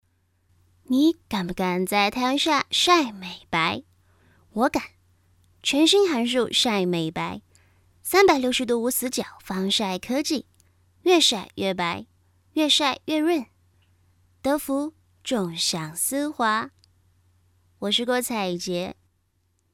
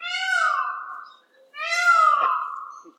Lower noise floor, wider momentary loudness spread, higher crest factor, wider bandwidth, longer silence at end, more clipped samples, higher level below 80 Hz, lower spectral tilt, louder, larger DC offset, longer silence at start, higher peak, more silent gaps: first, -69 dBFS vs -52 dBFS; second, 13 LU vs 19 LU; first, 22 dB vs 16 dB; first, 17.5 kHz vs 14 kHz; first, 0.8 s vs 0.1 s; neither; first, -60 dBFS vs under -90 dBFS; first, -3 dB/octave vs 3.5 dB/octave; second, -23 LUFS vs -20 LUFS; neither; first, 0.9 s vs 0 s; first, -2 dBFS vs -8 dBFS; neither